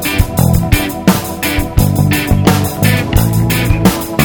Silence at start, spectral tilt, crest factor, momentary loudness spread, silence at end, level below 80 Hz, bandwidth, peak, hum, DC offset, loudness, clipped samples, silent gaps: 0 s; -5.5 dB/octave; 12 dB; 3 LU; 0 s; -20 dBFS; over 20 kHz; 0 dBFS; none; under 0.1%; -12 LUFS; 0.6%; none